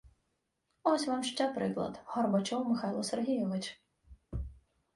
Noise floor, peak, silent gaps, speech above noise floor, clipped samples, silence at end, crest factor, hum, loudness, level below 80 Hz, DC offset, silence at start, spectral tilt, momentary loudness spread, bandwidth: -81 dBFS; -14 dBFS; none; 48 dB; under 0.1%; 0.4 s; 20 dB; none; -34 LUFS; -54 dBFS; under 0.1%; 0.05 s; -5 dB/octave; 12 LU; 11.5 kHz